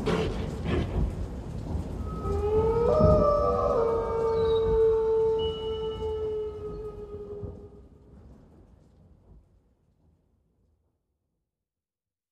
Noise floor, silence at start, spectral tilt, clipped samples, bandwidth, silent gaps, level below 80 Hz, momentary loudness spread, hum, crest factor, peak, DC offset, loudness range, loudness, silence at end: under -90 dBFS; 0 s; -8 dB/octave; under 0.1%; 9.6 kHz; none; -38 dBFS; 17 LU; none; 20 dB; -8 dBFS; under 0.1%; 19 LU; -27 LUFS; 4 s